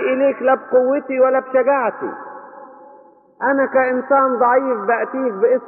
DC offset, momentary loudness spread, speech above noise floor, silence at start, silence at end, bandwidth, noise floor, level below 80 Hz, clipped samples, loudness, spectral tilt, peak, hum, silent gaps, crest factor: under 0.1%; 10 LU; 30 dB; 0 s; 0 s; 3 kHz; -46 dBFS; -76 dBFS; under 0.1%; -17 LUFS; -4 dB/octave; -4 dBFS; none; none; 14 dB